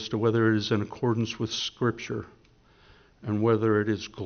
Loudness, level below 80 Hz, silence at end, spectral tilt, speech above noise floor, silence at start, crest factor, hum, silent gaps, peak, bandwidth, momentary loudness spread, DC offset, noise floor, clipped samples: -27 LUFS; -60 dBFS; 0 s; -5.5 dB/octave; 32 dB; 0 s; 18 dB; none; none; -10 dBFS; 6.6 kHz; 11 LU; under 0.1%; -59 dBFS; under 0.1%